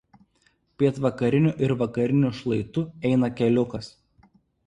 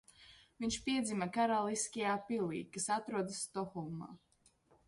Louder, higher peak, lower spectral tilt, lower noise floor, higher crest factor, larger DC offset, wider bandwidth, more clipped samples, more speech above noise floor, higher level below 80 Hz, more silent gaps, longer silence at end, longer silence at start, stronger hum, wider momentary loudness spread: first, -24 LUFS vs -38 LUFS; first, -8 dBFS vs -22 dBFS; first, -8.5 dB/octave vs -4 dB/octave; second, -66 dBFS vs -71 dBFS; about the same, 18 dB vs 16 dB; neither; second, 10 kHz vs 11.5 kHz; neither; first, 43 dB vs 33 dB; first, -56 dBFS vs -68 dBFS; neither; about the same, 0.8 s vs 0.7 s; first, 0.8 s vs 0.2 s; neither; about the same, 8 LU vs 10 LU